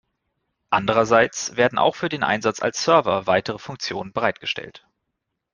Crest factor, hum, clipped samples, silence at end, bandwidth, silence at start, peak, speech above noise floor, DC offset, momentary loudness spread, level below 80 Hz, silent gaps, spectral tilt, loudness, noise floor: 20 dB; none; under 0.1%; 0.75 s; 10 kHz; 0.7 s; -2 dBFS; 58 dB; under 0.1%; 11 LU; -58 dBFS; none; -3.5 dB/octave; -21 LUFS; -79 dBFS